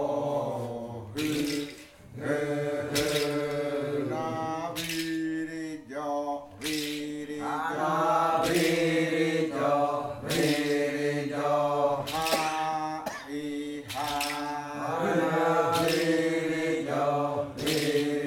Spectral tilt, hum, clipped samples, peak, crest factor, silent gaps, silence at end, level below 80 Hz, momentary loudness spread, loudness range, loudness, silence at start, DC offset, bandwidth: -4.5 dB/octave; none; under 0.1%; -12 dBFS; 16 dB; none; 0 s; -60 dBFS; 10 LU; 5 LU; -29 LUFS; 0 s; under 0.1%; 18 kHz